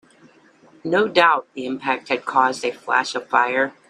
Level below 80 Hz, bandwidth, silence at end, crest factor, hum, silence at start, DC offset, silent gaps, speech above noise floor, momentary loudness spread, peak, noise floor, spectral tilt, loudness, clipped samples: -70 dBFS; 11.5 kHz; 0.2 s; 20 dB; none; 0.85 s; under 0.1%; none; 32 dB; 11 LU; 0 dBFS; -52 dBFS; -3.5 dB/octave; -20 LUFS; under 0.1%